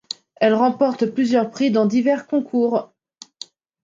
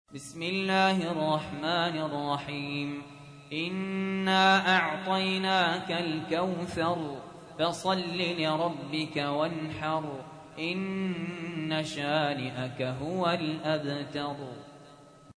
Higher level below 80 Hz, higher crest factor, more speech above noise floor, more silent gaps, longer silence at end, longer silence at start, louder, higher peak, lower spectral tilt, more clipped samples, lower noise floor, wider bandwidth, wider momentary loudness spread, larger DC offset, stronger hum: about the same, -70 dBFS vs -66 dBFS; second, 16 dB vs 22 dB; about the same, 24 dB vs 23 dB; neither; first, 1 s vs 0.2 s; first, 0.4 s vs 0.1 s; first, -19 LUFS vs -30 LUFS; first, -4 dBFS vs -8 dBFS; about the same, -6 dB/octave vs -5 dB/octave; neither; second, -42 dBFS vs -53 dBFS; second, 7.6 kHz vs 11 kHz; first, 20 LU vs 12 LU; neither; neither